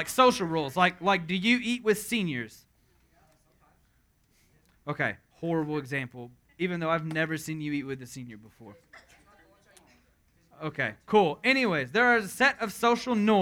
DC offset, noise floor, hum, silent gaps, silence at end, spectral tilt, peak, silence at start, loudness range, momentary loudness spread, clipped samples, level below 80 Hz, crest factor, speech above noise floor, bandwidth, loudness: under 0.1%; -67 dBFS; none; none; 0 s; -4.5 dB/octave; -6 dBFS; 0 s; 12 LU; 16 LU; under 0.1%; -64 dBFS; 22 dB; 40 dB; 20 kHz; -27 LUFS